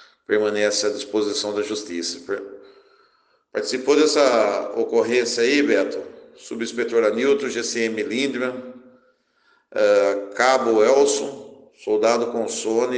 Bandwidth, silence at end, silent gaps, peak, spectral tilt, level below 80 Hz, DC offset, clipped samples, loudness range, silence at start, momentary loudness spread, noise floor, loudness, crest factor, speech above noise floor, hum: 10 kHz; 0 s; none; -4 dBFS; -2.5 dB/octave; -72 dBFS; under 0.1%; under 0.1%; 5 LU; 0.3 s; 14 LU; -62 dBFS; -21 LUFS; 18 dB; 42 dB; none